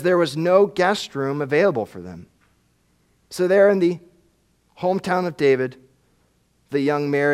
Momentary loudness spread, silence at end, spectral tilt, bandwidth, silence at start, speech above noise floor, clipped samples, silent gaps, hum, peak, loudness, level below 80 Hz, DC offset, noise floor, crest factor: 13 LU; 0 s; -6 dB/octave; 14 kHz; 0 s; 44 dB; under 0.1%; none; none; -2 dBFS; -20 LUFS; -64 dBFS; under 0.1%; -63 dBFS; 18 dB